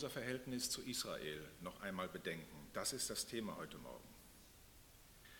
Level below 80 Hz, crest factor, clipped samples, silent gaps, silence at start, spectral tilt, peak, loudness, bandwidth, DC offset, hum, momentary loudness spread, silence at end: -68 dBFS; 20 dB; under 0.1%; none; 0 s; -2.5 dB/octave; -28 dBFS; -45 LUFS; 18 kHz; under 0.1%; none; 21 LU; 0 s